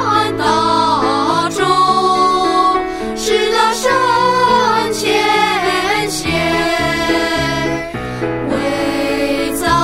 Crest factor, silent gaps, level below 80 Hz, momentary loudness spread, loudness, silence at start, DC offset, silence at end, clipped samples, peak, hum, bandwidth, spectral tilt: 14 dB; none; -38 dBFS; 6 LU; -14 LUFS; 0 s; under 0.1%; 0 s; under 0.1%; 0 dBFS; none; 16 kHz; -3.5 dB/octave